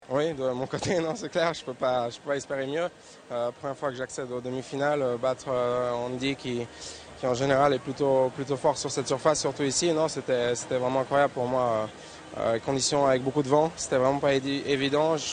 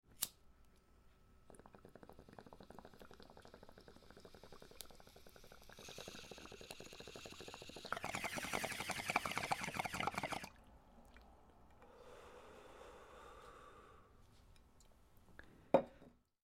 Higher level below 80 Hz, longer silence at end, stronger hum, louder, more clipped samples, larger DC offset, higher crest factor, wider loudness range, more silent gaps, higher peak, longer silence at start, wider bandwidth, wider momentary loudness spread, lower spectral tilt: first, -60 dBFS vs -68 dBFS; second, 0 s vs 0.25 s; neither; first, -27 LUFS vs -44 LUFS; neither; neither; second, 18 dB vs 32 dB; second, 5 LU vs 19 LU; neither; first, -8 dBFS vs -16 dBFS; about the same, 0 s vs 0.05 s; second, 9.8 kHz vs 16.5 kHz; second, 9 LU vs 25 LU; first, -4.5 dB/octave vs -3 dB/octave